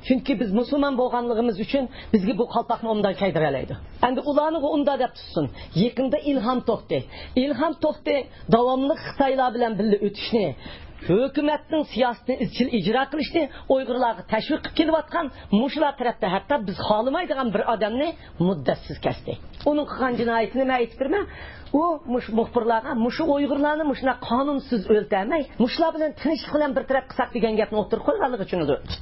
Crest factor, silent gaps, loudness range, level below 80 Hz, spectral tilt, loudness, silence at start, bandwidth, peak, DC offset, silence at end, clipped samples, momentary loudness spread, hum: 18 dB; none; 2 LU; -46 dBFS; -10.5 dB/octave; -24 LUFS; 0 s; 5.8 kHz; -6 dBFS; under 0.1%; 0 s; under 0.1%; 5 LU; none